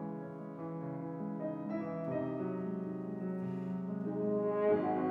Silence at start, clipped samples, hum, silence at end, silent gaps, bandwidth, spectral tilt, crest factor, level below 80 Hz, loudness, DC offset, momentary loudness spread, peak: 0 s; under 0.1%; none; 0 s; none; 4.5 kHz; -10.5 dB/octave; 16 dB; -78 dBFS; -37 LUFS; under 0.1%; 11 LU; -20 dBFS